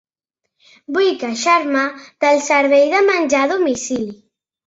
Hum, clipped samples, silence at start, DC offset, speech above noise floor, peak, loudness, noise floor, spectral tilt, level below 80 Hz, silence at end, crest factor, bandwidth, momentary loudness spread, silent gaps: none; under 0.1%; 0.9 s; under 0.1%; 62 dB; -2 dBFS; -16 LUFS; -78 dBFS; -2.5 dB/octave; -60 dBFS; 0.55 s; 14 dB; 8 kHz; 10 LU; none